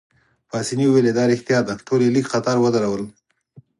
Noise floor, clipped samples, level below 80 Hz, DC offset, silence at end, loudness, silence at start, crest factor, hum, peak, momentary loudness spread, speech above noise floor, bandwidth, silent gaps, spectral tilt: -51 dBFS; under 0.1%; -60 dBFS; under 0.1%; 0.2 s; -19 LUFS; 0.55 s; 14 dB; none; -6 dBFS; 11 LU; 32 dB; 11.5 kHz; none; -6 dB/octave